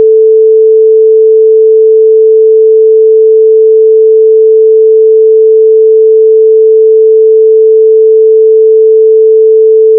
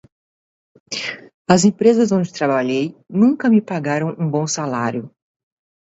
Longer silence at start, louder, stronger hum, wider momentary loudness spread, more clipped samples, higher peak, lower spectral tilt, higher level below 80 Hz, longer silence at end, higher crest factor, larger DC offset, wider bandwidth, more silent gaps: second, 0 s vs 0.9 s; first, -4 LUFS vs -18 LUFS; neither; second, 0 LU vs 12 LU; first, 0.6% vs under 0.1%; about the same, 0 dBFS vs 0 dBFS; first, -11 dB/octave vs -5.5 dB/octave; second, under -90 dBFS vs -60 dBFS; second, 0 s vs 0.85 s; second, 4 dB vs 18 dB; neither; second, 0.5 kHz vs 8 kHz; second, none vs 1.34-1.45 s